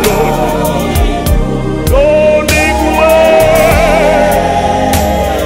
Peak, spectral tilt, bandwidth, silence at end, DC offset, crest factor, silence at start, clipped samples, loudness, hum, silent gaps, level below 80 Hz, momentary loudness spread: 0 dBFS; -5 dB/octave; 16.5 kHz; 0 s; under 0.1%; 8 dB; 0 s; 0.1%; -9 LUFS; none; none; -18 dBFS; 6 LU